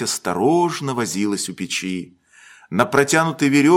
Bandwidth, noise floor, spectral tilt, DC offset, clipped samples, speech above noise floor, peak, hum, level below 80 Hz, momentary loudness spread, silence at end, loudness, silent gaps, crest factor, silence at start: 16.5 kHz; -48 dBFS; -4.5 dB/octave; under 0.1%; under 0.1%; 30 dB; 0 dBFS; none; -60 dBFS; 10 LU; 0 s; -20 LUFS; none; 18 dB; 0 s